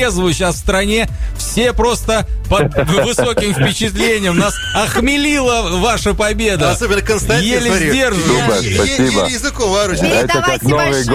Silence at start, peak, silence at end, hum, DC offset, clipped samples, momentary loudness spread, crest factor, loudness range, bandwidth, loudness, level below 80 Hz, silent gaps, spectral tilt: 0 s; -2 dBFS; 0 s; none; 0.3%; under 0.1%; 3 LU; 12 dB; 1 LU; 16 kHz; -14 LUFS; -24 dBFS; none; -4 dB/octave